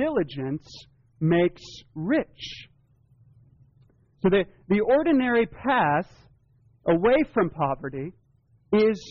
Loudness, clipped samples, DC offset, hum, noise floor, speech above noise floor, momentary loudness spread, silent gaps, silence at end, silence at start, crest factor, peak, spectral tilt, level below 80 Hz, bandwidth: -24 LUFS; under 0.1%; under 0.1%; none; -62 dBFS; 39 dB; 17 LU; none; 0 s; 0 s; 14 dB; -12 dBFS; -5.5 dB/octave; -54 dBFS; 7.2 kHz